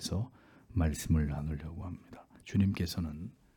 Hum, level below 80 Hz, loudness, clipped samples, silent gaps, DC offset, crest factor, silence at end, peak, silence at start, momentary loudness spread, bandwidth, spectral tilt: none; -46 dBFS; -35 LUFS; under 0.1%; none; under 0.1%; 18 dB; 0.25 s; -16 dBFS; 0 s; 15 LU; 18 kHz; -6 dB/octave